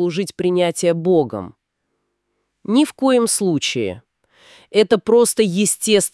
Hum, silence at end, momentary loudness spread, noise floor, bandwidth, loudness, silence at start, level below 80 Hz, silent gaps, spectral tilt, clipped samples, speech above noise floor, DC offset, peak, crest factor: none; 0.05 s; 12 LU; -73 dBFS; 12 kHz; -17 LUFS; 0 s; -64 dBFS; none; -4 dB/octave; under 0.1%; 56 dB; under 0.1%; 0 dBFS; 18 dB